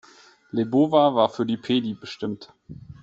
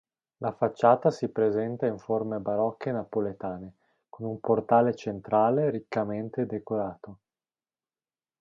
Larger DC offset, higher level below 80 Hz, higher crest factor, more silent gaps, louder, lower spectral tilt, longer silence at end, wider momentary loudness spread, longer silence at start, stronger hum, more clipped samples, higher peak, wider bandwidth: neither; about the same, -62 dBFS vs -66 dBFS; about the same, 20 dB vs 20 dB; neither; first, -23 LUFS vs -28 LUFS; second, -7 dB/octave vs -8.5 dB/octave; second, 0.1 s vs 1.25 s; first, 18 LU vs 14 LU; first, 0.55 s vs 0.4 s; neither; neither; first, -4 dBFS vs -8 dBFS; about the same, 7.8 kHz vs 7.6 kHz